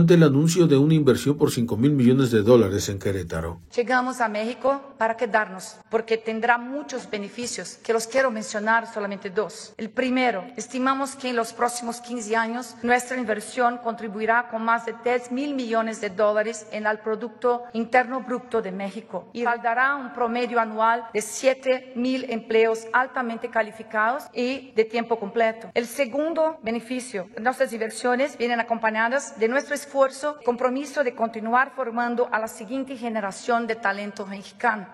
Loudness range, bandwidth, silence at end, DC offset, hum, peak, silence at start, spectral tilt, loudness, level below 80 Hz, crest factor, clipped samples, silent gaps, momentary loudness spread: 4 LU; 16 kHz; 0 s; under 0.1%; none; -4 dBFS; 0 s; -5.5 dB/octave; -24 LUFS; -58 dBFS; 20 dB; under 0.1%; none; 11 LU